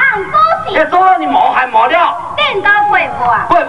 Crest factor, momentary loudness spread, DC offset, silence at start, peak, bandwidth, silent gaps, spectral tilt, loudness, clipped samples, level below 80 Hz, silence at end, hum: 10 dB; 4 LU; under 0.1%; 0 s; 0 dBFS; 11 kHz; none; -4.5 dB/octave; -10 LUFS; under 0.1%; -42 dBFS; 0 s; none